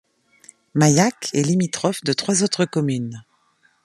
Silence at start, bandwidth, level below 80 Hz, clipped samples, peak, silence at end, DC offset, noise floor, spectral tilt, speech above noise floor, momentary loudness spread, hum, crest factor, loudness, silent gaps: 0.75 s; 13 kHz; -62 dBFS; under 0.1%; -2 dBFS; 0.65 s; under 0.1%; -61 dBFS; -4.5 dB/octave; 42 dB; 11 LU; none; 20 dB; -20 LUFS; none